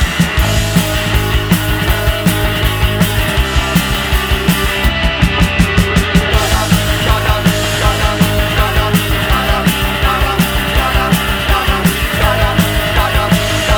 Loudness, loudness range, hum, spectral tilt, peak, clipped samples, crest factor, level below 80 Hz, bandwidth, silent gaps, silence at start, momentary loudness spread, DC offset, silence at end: -13 LUFS; 1 LU; none; -4.5 dB/octave; 0 dBFS; under 0.1%; 12 dB; -18 dBFS; over 20 kHz; none; 0 s; 2 LU; under 0.1%; 0 s